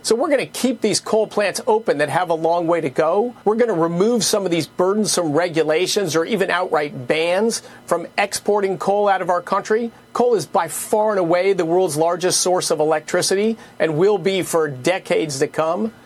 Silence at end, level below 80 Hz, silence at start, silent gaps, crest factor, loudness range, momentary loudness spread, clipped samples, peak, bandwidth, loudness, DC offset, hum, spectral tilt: 0.15 s; -64 dBFS; 0.05 s; none; 18 dB; 2 LU; 4 LU; under 0.1%; -2 dBFS; 14.5 kHz; -19 LUFS; under 0.1%; none; -3.5 dB/octave